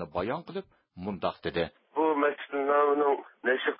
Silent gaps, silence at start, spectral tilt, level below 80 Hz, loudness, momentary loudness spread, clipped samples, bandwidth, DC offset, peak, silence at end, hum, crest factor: none; 0 s; -9.5 dB/octave; -60 dBFS; -29 LUFS; 13 LU; under 0.1%; 5.4 kHz; under 0.1%; -12 dBFS; 0.05 s; none; 18 dB